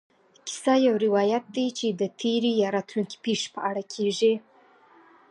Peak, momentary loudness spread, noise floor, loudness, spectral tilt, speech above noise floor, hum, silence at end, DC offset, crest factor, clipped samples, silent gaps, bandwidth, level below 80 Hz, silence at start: -10 dBFS; 9 LU; -57 dBFS; -25 LUFS; -4.5 dB/octave; 32 dB; none; 0.9 s; under 0.1%; 16 dB; under 0.1%; none; 11.5 kHz; -80 dBFS; 0.45 s